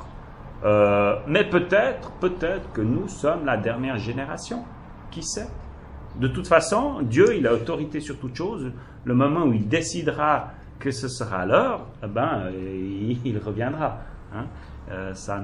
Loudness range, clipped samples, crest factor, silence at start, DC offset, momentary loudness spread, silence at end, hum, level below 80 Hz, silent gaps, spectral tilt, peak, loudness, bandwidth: 6 LU; under 0.1%; 22 dB; 0 s; under 0.1%; 18 LU; 0 s; none; -44 dBFS; none; -6 dB/octave; -2 dBFS; -24 LUFS; 11.5 kHz